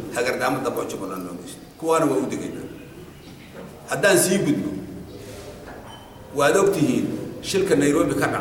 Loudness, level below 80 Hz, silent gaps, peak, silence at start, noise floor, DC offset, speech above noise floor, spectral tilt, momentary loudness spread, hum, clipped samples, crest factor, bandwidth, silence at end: -22 LUFS; -52 dBFS; none; -4 dBFS; 0 s; -42 dBFS; under 0.1%; 21 dB; -4.5 dB/octave; 22 LU; none; under 0.1%; 18 dB; 17 kHz; 0 s